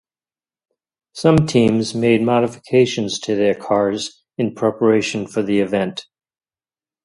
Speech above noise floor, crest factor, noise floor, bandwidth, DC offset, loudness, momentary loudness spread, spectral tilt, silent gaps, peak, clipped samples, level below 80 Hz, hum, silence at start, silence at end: over 73 dB; 18 dB; under -90 dBFS; 11.5 kHz; under 0.1%; -18 LUFS; 9 LU; -6 dB/octave; none; 0 dBFS; under 0.1%; -50 dBFS; none; 1.15 s; 1.05 s